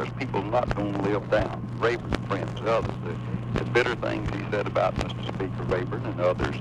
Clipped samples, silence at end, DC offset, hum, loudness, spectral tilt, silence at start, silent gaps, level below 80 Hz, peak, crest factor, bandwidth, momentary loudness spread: under 0.1%; 0 s; under 0.1%; none; -27 LUFS; -7 dB/octave; 0 s; none; -42 dBFS; -6 dBFS; 20 dB; 9.8 kHz; 6 LU